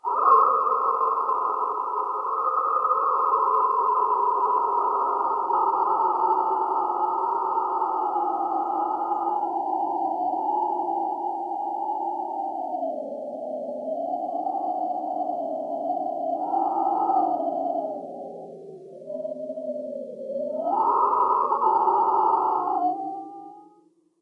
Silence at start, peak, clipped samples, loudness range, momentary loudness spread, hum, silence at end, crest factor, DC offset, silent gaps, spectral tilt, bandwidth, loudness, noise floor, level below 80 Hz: 0.05 s; -6 dBFS; under 0.1%; 7 LU; 12 LU; none; 0.55 s; 18 dB; under 0.1%; none; -7.5 dB/octave; 5.2 kHz; -24 LUFS; -60 dBFS; -84 dBFS